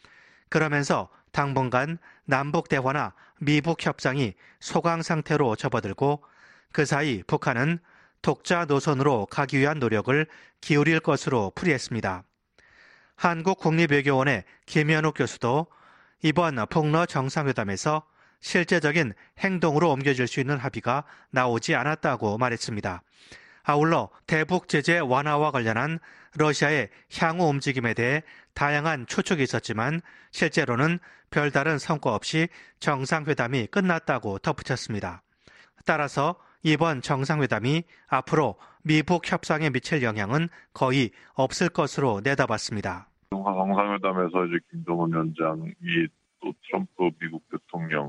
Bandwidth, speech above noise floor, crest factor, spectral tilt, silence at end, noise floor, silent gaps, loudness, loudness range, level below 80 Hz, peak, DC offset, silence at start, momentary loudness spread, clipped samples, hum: 11 kHz; 35 dB; 20 dB; -5.5 dB/octave; 0 s; -60 dBFS; none; -25 LUFS; 3 LU; -60 dBFS; -4 dBFS; under 0.1%; 0.5 s; 9 LU; under 0.1%; none